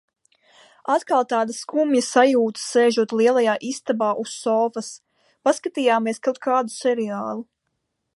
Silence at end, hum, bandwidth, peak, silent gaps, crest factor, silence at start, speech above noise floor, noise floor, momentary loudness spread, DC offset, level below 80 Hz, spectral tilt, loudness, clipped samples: 0.75 s; none; 11.5 kHz; -2 dBFS; none; 20 dB; 0.85 s; 56 dB; -76 dBFS; 8 LU; under 0.1%; -78 dBFS; -3.5 dB/octave; -21 LUFS; under 0.1%